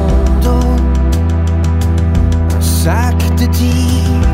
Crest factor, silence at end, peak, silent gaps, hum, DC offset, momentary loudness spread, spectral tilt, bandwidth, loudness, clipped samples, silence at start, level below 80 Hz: 10 dB; 0 s; 0 dBFS; none; none; under 0.1%; 1 LU; -6.5 dB/octave; 16.5 kHz; -13 LUFS; under 0.1%; 0 s; -14 dBFS